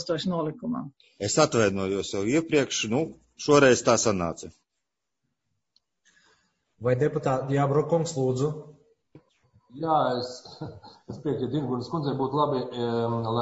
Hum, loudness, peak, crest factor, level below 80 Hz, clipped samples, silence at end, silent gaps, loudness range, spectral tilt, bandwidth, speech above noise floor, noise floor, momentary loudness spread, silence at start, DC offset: none; -26 LUFS; -4 dBFS; 22 dB; -60 dBFS; under 0.1%; 0 s; none; 7 LU; -5 dB/octave; 8 kHz; 59 dB; -84 dBFS; 14 LU; 0 s; under 0.1%